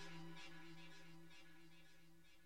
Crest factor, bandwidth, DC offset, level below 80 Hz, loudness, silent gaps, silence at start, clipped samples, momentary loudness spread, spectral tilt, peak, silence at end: 16 dB; 16.5 kHz; 0.1%; -82 dBFS; -61 LUFS; none; 0 s; under 0.1%; 12 LU; -4 dB/octave; -42 dBFS; 0 s